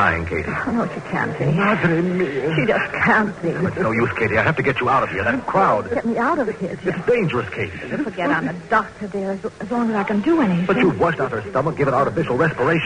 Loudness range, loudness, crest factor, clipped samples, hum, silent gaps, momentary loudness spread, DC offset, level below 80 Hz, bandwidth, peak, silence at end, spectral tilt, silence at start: 3 LU; -20 LUFS; 14 dB; under 0.1%; none; none; 8 LU; under 0.1%; -46 dBFS; 10 kHz; -4 dBFS; 0 s; -7.5 dB/octave; 0 s